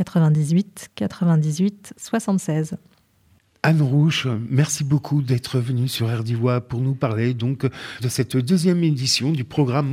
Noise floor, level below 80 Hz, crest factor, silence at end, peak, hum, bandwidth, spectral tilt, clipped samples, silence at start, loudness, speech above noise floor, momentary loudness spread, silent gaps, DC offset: -59 dBFS; -58 dBFS; 16 dB; 0 s; -4 dBFS; none; 15.5 kHz; -6 dB/octave; under 0.1%; 0 s; -21 LUFS; 39 dB; 8 LU; none; under 0.1%